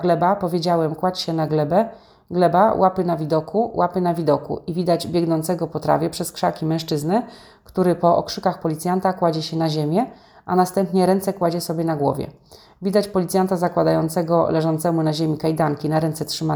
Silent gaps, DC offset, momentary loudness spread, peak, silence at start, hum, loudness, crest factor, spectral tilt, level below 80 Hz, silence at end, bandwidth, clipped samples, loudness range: none; under 0.1%; 6 LU; -2 dBFS; 0 s; none; -21 LUFS; 18 dB; -6.5 dB/octave; -54 dBFS; 0 s; over 20 kHz; under 0.1%; 2 LU